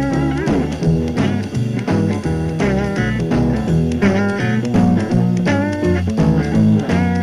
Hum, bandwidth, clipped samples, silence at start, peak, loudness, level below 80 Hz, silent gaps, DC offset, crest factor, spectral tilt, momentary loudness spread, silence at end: none; 11.5 kHz; under 0.1%; 0 s; -2 dBFS; -17 LUFS; -32 dBFS; none; under 0.1%; 14 dB; -7.5 dB/octave; 4 LU; 0 s